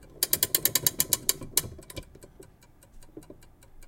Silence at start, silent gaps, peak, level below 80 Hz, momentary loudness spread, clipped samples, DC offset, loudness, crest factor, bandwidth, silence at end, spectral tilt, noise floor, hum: 0.15 s; none; -4 dBFS; -52 dBFS; 20 LU; under 0.1%; under 0.1%; -25 LUFS; 28 dB; 17 kHz; 0 s; -1 dB/octave; -56 dBFS; none